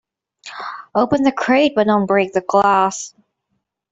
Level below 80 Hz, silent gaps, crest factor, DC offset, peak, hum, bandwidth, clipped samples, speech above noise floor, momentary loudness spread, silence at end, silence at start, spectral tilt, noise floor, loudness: -58 dBFS; none; 16 dB; under 0.1%; -2 dBFS; none; 8.2 kHz; under 0.1%; 57 dB; 16 LU; 0.85 s; 0.45 s; -5 dB/octave; -73 dBFS; -16 LUFS